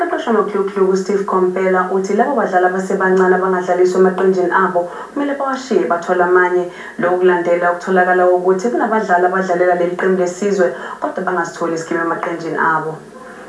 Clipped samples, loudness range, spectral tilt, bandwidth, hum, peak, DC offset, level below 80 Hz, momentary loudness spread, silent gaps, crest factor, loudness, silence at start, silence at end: under 0.1%; 3 LU; -6 dB/octave; 11 kHz; none; 0 dBFS; under 0.1%; -62 dBFS; 8 LU; none; 16 dB; -15 LUFS; 0 s; 0 s